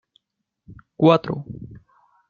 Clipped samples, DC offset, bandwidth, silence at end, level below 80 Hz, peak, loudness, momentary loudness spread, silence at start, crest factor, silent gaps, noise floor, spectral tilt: under 0.1%; under 0.1%; 7 kHz; 0.55 s; -58 dBFS; -2 dBFS; -19 LUFS; 22 LU; 0.7 s; 22 dB; none; -78 dBFS; -8.5 dB/octave